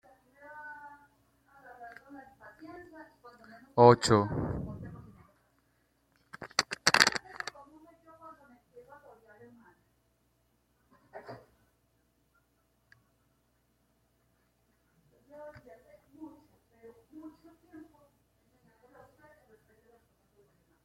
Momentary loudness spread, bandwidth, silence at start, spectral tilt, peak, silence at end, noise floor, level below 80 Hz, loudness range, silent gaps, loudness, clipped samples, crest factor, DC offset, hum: 30 LU; 16 kHz; 0.55 s; -4 dB/octave; -2 dBFS; 3.05 s; -73 dBFS; -62 dBFS; 24 LU; none; -27 LUFS; under 0.1%; 34 dB; under 0.1%; none